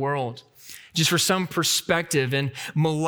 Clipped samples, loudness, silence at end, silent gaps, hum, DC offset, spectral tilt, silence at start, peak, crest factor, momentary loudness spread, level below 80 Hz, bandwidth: under 0.1%; -23 LUFS; 0 s; none; none; under 0.1%; -3.5 dB/octave; 0 s; -6 dBFS; 18 dB; 16 LU; -62 dBFS; over 20 kHz